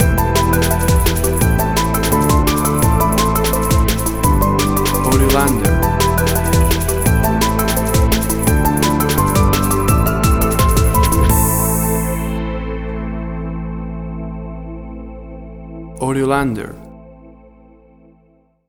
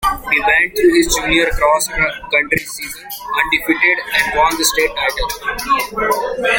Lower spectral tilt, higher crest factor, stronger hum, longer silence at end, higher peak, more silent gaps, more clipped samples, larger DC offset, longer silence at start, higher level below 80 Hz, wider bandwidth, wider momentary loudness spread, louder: first, -5 dB/octave vs -2 dB/octave; about the same, 14 dB vs 16 dB; neither; first, 1.4 s vs 0 s; about the same, 0 dBFS vs 0 dBFS; neither; neither; neither; about the same, 0 s vs 0 s; first, -20 dBFS vs -32 dBFS; first, over 20 kHz vs 17 kHz; first, 13 LU vs 8 LU; about the same, -15 LUFS vs -14 LUFS